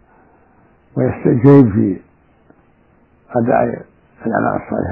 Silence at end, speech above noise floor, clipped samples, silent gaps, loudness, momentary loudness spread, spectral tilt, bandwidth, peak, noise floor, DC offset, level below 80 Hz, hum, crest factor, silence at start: 0 s; 39 dB; under 0.1%; none; -15 LUFS; 18 LU; -12 dB/octave; 3.7 kHz; 0 dBFS; -53 dBFS; under 0.1%; -48 dBFS; none; 16 dB; 0.95 s